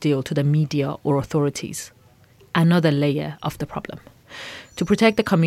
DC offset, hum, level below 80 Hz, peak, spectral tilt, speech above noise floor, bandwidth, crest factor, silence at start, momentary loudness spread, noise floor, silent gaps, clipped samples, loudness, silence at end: under 0.1%; none; -52 dBFS; -4 dBFS; -6.5 dB/octave; 32 dB; 15 kHz; 18 dB; 0 s; 18 LU; -52 dBFS; none; under 0.1%; -21 LUFS; 0 s